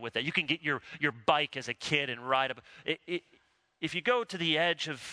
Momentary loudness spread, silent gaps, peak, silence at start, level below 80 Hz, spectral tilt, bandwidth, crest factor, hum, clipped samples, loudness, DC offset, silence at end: 8 LU; none; -10 dBFS; 0 s; -70 dBFS; -4 dB/octave; 11 kHz; 24 dB; none; under 0.1%; -31 LUFS; under 0.1%; 0 s